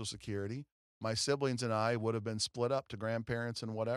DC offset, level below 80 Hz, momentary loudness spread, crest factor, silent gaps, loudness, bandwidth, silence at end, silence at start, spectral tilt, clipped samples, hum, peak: under 0.1%; -68 dBFS; 7 LU; 18 dB; 0.72-1.01 s; -36 LUFS; 13.5 kHz; 0 s; 0 s; -4.5 dB/octave; under 0.1%; none; -18 dBFS